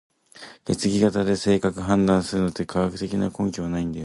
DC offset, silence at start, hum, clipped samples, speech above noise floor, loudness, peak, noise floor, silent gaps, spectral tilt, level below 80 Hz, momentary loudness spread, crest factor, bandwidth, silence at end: under 0.1%; 0.35 s; none; under 0.1%; 24 dB; -23 LUFS; -6 dBFS; -46 dBFS; none; -6 dB/octave; -46 dBFS; 8 LU; 18 dB; 11.5 kHz; 0 s